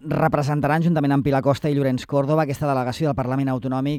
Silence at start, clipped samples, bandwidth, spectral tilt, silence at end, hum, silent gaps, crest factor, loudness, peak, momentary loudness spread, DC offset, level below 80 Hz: 0.05 s; under 0.1%; 14.5 kHz; -8 dB/octave; 0 s; none; none; 14 dB; -21 LUFS; -6 dBFS; 4 LU; under 0.1%; -50 dBFS